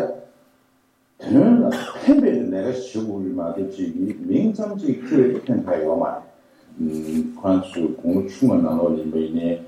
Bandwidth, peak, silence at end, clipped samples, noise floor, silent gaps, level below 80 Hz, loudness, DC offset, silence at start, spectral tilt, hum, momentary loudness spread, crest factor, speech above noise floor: 12 kHz; -4 dBFS; 0 s; under 0.1%; -62 dBFS; none; -60 dBFS; -21 LUFS; under 0.1%; 0 s; -8 dB/octave; none; 10 LU; 18 dB; 40 dB